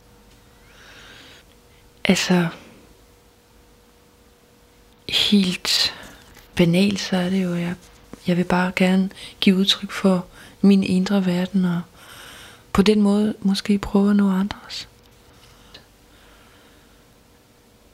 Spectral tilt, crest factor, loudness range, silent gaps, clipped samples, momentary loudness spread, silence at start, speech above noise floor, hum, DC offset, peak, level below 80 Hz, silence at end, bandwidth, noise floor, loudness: -5.5 dB/octave; 20 dB; 6 LU; none; under 0.1%; 22 LU; 2.05 s; 34 dB; none; under 0.1%; -2 dBFS; -50 dBFS; 2.15 s; 15.5 kHz; -53 dBFS; -20 LUFS